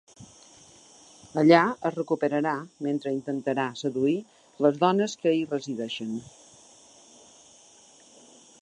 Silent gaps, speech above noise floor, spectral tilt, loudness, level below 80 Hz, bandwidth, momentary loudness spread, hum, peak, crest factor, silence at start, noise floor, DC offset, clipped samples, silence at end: none; 30 dB; -6 dB/octave; -26 LUFS; -72 dBFS; 10.5 kHz; 12 LU; none; -4 dBFS; 24 dB; 0.2 s; -55 dBFS; under 0.1%; under 0.1%; 2.4 s